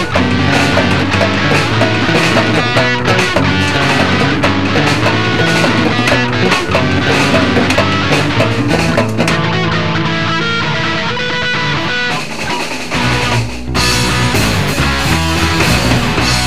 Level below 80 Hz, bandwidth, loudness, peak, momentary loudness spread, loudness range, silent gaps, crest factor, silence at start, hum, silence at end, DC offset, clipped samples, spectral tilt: -30 dBFS; 16 kHz; -12 LUFS; 0 dBFS; 4 LU; 3 LU; none; 12 dB; 0 s; none; 0 s; 5%; under 0.1%; -4.5 dB/octave